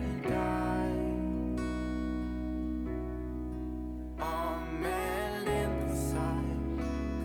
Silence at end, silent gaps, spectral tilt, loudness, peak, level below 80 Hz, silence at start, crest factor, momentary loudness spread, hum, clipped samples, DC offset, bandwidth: 0 s; none; -6.5 dB/octave; -34 LUFS; -20 dBFS; -40 dBFS; 0 s; 14 dB; 7 LU; none; under 0.1%; under 0.1%; 18.5 kHz